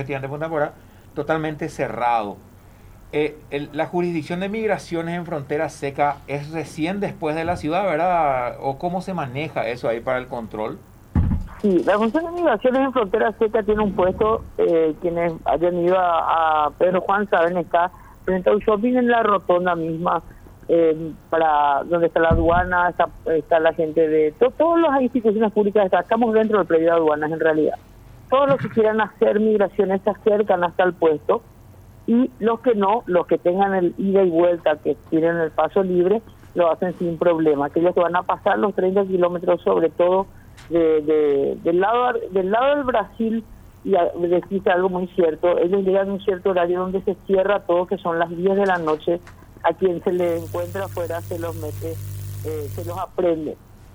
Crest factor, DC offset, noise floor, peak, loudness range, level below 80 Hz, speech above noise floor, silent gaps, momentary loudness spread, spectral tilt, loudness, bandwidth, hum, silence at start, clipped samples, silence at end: 16 dB; under 0.1%; -45 dBFS; -4 dBFS; 6 LU; -42 dBFS; 25 dB; none; 9 LU; -7.5 dB/octave; -20 LUFS; over 20 kHz; none; 0 s; under 0.1%; 0.2 s